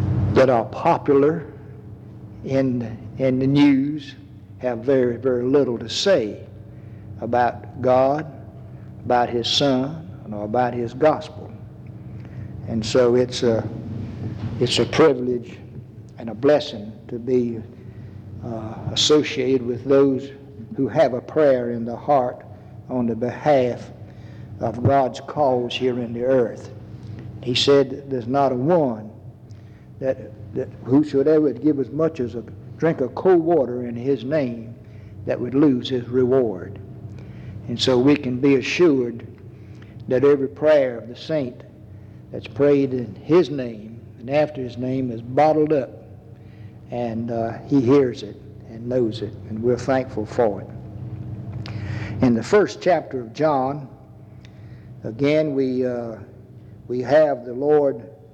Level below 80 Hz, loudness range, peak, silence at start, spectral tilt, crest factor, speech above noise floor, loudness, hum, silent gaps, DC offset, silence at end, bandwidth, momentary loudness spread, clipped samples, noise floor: -52 dBFS; 3 LU; -4 dBFS; 0 s; -6 dB/octave; 16 dB; 23 dB; -21 LUFS; none; none; under 0.1%; 0.1 s; 9.2 kHz; 21 LU; under 0.1%; -43 dBFS